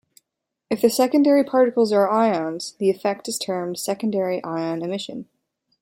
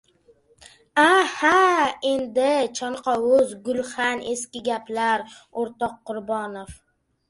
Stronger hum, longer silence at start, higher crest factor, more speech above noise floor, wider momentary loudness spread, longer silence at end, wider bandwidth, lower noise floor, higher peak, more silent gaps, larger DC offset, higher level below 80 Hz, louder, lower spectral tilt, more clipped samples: neither; second, 0.7 s vs 0.95 s; about the same, 18 dB vs 20 dB; first, 61 dB vs 36 dB; about the same, 11 LU vs 13 LU; about the same, 0.6 s vs 0.55 s; first, 16.5 kHz vs 11.5 kHz; first, -81 dBFS vs -58 dBFS; about the same, -4 dBFS vs -4 dBFS; neither; neither; second, -70 dBFS vs -60 dBFS; about the same, -21 LUFS vs -22 LUFS; first, -5 dB/octave vs -2.5 dB/octave; neither